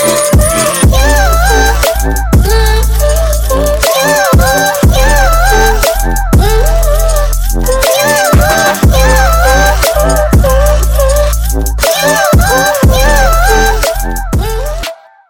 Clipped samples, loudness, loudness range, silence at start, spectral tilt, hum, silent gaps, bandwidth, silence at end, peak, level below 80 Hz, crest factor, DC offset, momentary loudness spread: under 0.1%; -9 LUFS; 1 LU; 0 s; -4 dB/octave; none; none; 17.5 kHz; 0.35 s; 0 dBFS; -10 dBFS; 8 dB; under 0.1%; 6 LU